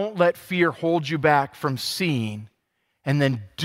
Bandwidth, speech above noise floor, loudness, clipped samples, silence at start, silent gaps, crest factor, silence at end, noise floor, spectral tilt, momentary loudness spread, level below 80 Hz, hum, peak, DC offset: 16 kHz; 51 dB; -23 LUFS; under 0.1%; 0 s; none; 20 dB; 0 s; -74 dBFS; -5.5 dB/octave; 8 LU; -64 dBFS; none; -4 dBFS; under 0.1%